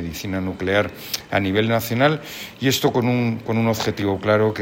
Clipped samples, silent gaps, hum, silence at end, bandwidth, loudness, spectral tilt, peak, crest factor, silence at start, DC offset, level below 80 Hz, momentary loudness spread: under 0.1%; none; none; 0 s; 17 kHz; -21 LUFS; -5.5 dB/octave; -4 dBFS; 16 dB; 0 s; under 0.1%; -50 dBFS; 8 LU